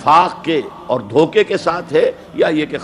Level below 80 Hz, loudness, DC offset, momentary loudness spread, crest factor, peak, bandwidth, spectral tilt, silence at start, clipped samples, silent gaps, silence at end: -52 dBFS; -16 LUFS; under 0.1%; 8 LU; 14 dB; 0 dBFS; 11 kHz; -5.5 dB/octave; 0 s; under 0.1%; none; 0 s